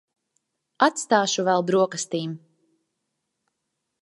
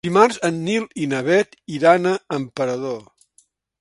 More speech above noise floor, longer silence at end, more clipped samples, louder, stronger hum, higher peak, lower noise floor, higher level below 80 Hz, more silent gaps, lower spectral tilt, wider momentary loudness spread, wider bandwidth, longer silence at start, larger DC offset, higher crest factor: first, 58 dB vs 41 dB; first, 1.65 s vs 0.8 s; neither; about the same, -22 LUFS vs -20 LUFS; neither; about the same, -2 dBFS vs 0 dBFS; first, -80 dBFS vs -60 dBFS; second, -80 dBFS vs -64 dBFS; neither; second, -3.5 dB/octave vs -5.5 dB/octave; about the same, 10 LU vs 11 LU; about the same, 11.5 kHz vs 11.5 kHz; first, 0.8 s vs 0.05 s; neither; about the same, 24 dB vs 20 dB